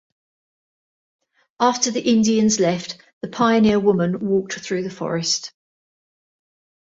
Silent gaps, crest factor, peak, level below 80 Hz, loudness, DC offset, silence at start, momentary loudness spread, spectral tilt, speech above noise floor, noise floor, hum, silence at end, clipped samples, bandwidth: 3.13-3.21 s; 18 dB; -4 dBFS; -58 dBFS; -19 LUFS; under 0.1%; 1.6 s; 11 LU; -4.5 dB/octave; over 71 dB; under -90 dBFS; none; 1.35 s; under 0.1%; 7.8 kHz